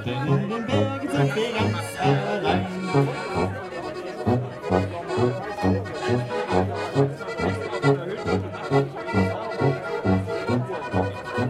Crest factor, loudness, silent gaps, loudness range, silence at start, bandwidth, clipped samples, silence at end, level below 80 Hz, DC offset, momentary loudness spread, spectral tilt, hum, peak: 18 dB; -25 LUFS; none; 2 LU; 0 s; 13 kHz; under 0.1%; 0 s; -52 dBFS; under 0.1%; 4 LU; -7 dB/octave; none; -6 dBFS